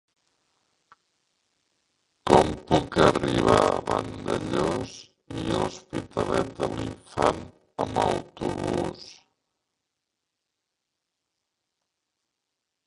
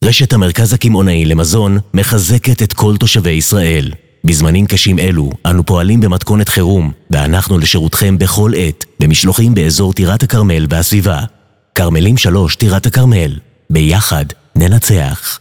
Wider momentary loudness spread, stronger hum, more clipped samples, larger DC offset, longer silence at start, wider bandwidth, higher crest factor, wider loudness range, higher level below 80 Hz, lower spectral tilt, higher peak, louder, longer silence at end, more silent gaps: first, 16 LU vs 6 LU; neither; neither; neither; first, 2.25 s vs 0 s; second, 11.5 kHz vs 18.5 kHz; first, 26 dB vs 10 dB; first, 9 LU vs 1 LU; second, -48 dBFS vs -24 dBFS; about the same, -5.5 dB/octave vs -5 dB/octave; about the same, -2 dBFS vs 0 dBFS; second, -25 LUFS vs -10 LUFS; first, 3.75 s vs 0.05 s; neither